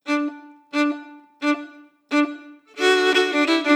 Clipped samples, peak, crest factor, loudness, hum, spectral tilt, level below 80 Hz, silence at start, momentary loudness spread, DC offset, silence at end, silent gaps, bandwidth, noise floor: under 0.1%; -4 dBFS; 18 dB; -21 LUFS; none; -1 dB/octave; -90 dBFS; 0.05 s; 16 LU; under 0.1%; 0 s; none; 15 kHz; -43 dBFS